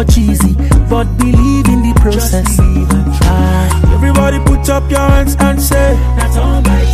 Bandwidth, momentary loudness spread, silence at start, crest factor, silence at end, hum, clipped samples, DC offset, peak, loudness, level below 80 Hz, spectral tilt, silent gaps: 15.5 kHz; 3 LU; 0 s; 8 dB; 0 s; none; under 0.1%; under 0.1%; 0 dBFS; -11 LUFS; -12 dBFS; -6 dB/octave; none